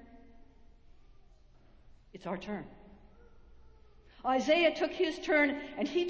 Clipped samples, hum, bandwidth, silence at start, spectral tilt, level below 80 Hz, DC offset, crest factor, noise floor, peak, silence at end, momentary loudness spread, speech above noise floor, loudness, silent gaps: under 0.1%; none; 8 kHz; 0.1 s; -4.5 dB/octave; -62 dBFS; under 0.1%; 20 dB; -59 dBFS; -14 dBFS; 0 s; 15 LU; 28 dB; -31 LUFS; none